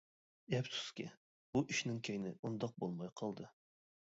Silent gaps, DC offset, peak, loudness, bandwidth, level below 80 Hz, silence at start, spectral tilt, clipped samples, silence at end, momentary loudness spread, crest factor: 1.17-1.53 s, 2.39-2.43 s; under 0.1%; -22 dBFS; -42 LUFS; 7.6 kHz; -76 dBFS; 0.5 s; -4.5 dB/octave; under 0.1%; 0.55 s; 11 LU; 20 dB